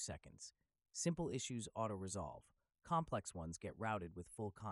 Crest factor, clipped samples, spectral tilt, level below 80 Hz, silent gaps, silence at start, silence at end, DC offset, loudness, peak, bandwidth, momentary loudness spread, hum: 20 dB; under 0.1%; -4.5 dB/octave; -66 dBFS; none; 0 s; 0 s; under 0.1%; -45 LUFS; -26 dBFS; 12 kHz; 12 LU; none